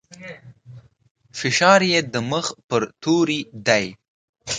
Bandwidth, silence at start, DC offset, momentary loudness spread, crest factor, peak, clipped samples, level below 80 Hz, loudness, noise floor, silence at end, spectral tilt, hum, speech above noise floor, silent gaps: 9.6 kHz; 0.1 s; under 0.1%; 23 LU; 22 dB; 0 dBFS; under 0.1%; -60 dBFS; -19 LUFS; -45 dBFS; 0 s; -3.5 dB/octave; none; 25 dB; 1.11-1.15 s, 2.64-2.69 s, 4.08-4.33 s